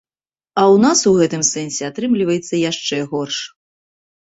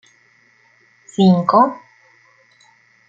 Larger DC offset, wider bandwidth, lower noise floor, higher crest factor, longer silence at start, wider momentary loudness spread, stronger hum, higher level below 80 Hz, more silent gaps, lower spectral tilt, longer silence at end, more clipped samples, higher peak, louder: neither; first, 8.4 kHz vs 7.4 kHz; first, under -90 dBFS vs -55 dBFS; about the same, 16 dB vs 18 dB; second, 0.55 s vs 1.2 s; second, 12 LU vs 18 LU; neither; about the same, -58 dBFS vs -62 dBFS; neither; second, -4 dB/octave vs -8 dB/octave; second, 0.85 s vs 1.35 s; neither; about the same, -2 dBFS vs -2 dBFS; about the same, -16 LUFS vs -14 LUFS